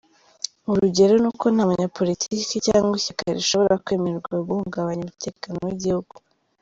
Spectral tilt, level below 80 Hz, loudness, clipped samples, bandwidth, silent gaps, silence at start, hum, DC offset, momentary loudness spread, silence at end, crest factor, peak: -5 dB/octave; -54 dBFS; -22 LUFS; under 0.1%; 7.8 kHz; none; 0.65 s; none; under 0.1%; 13 LU; 0.6 s; 18 dB; -4 dBFS